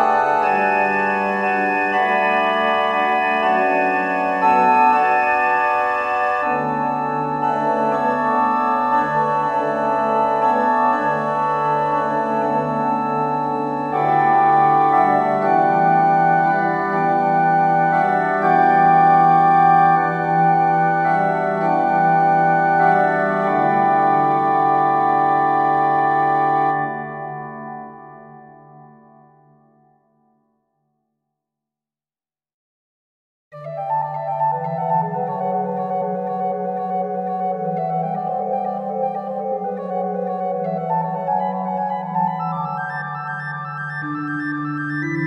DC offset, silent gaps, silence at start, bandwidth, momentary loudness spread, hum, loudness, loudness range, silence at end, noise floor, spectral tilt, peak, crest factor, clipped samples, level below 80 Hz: under 0.1%; 32.54-33.51 s; 0 s; 7 kHz; 10 LU; none; -18 LUFS; 9 LU; 0 s; under -90 dBFS; -7.5 dB/octave; -4 dBFS; 14 dB; under 0.1%; -60 dBFS